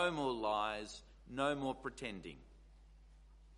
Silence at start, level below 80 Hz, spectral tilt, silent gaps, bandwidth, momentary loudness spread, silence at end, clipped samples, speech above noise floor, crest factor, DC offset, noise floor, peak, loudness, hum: 0 s; -62 dBFS; -4.5 dB/octave; none; 11.5 kHz; 16 LU; 0 s; under 0.1%; 21 dB; 22 dB; under 0.1%; -61 dBFS; -20 dBFS; -40 LUFS; none